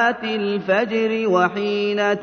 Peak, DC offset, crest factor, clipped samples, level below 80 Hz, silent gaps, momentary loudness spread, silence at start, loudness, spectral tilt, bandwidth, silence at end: -4 dBFS; under 0.1%; 16 dB; under 0.1%; -64 dBFS; none; 4 LU; 0 s; -20 LUFS; -5.5 dB/octave; 6.6 kHz; 0 s